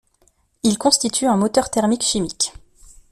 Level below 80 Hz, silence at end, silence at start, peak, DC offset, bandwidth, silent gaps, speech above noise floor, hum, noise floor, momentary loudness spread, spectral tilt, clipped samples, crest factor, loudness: -48 dBFS; 0.6 s; 0.65 s; 0 dBFS; under 0.1%; 14 kHz; none; 42 dB; none; -61 dBFS; 6 LU; -3.5 dB/octave; under 0.1%; 20 dB; -19 LUFS